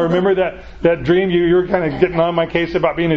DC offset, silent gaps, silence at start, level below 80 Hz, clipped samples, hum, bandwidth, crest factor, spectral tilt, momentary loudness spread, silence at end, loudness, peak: under 0.1%; none; 0 s; -40 dBFS; under 0.1%; none; 6.2 kHz; 16 dB; -8.5 dB/octave; 4 LU; 0 s; -16 LUFS; 0 dBFS